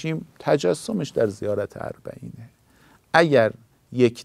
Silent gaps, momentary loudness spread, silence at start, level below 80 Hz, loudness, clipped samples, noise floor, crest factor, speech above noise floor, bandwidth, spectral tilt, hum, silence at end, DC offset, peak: none; 19 LU; 0 s; -60 dBFS; -22 LUFS; under 0.1%; -56 dBFS; 22 dB; 34 dB; 14.5 kHz; -6 dB/octave; none; 0 s; under 0.1%; -2 dBFS